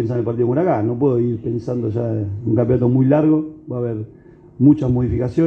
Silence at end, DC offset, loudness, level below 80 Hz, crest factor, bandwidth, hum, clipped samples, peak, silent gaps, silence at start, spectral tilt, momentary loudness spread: 0 s; under 0.1%; -18 LUFS; -42 dBFS; 16 dB; 6.2 kHz; none; under 0.1%; -2 dBFS; none; 0 s; -11 dB/octave; 10 LU